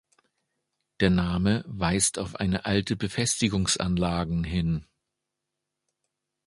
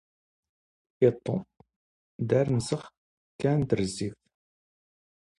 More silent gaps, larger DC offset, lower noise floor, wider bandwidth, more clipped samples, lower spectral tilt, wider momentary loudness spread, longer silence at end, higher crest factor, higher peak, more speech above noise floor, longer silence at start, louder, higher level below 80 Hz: second, none vs 1.76-2.19 s, 2.98-3.39 s; neither; second, -84 dBFS vs under -90 dBFS; about the same, 11.5 kHz vs 11.5 kHz; neither; second, -4.5 dB/octave vs -7 dB/octave; second, 5 LU vs 10 LU; first, 1.65 s vs 1.25 s; about the same, 22 dB vs 22 dB; about the same, -6 dBFS vs -8 dBFS; second, 59 dB vs over 64 dB; about the same, 1 s vs 1 s; about the same, -26 LUFS vs -28 LUFS; first, -44 dBFS vs -58 dBFS